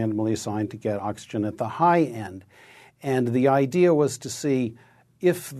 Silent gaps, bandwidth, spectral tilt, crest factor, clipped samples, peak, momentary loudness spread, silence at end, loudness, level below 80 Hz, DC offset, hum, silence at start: none; 13.5 kHz; -6.5 dB/octave; 18 dB; under 0.1%; -6 dBFS; 11 LU; 0 s; -24 LUFS; -64 dBFS; under 0.1%; none; 0 s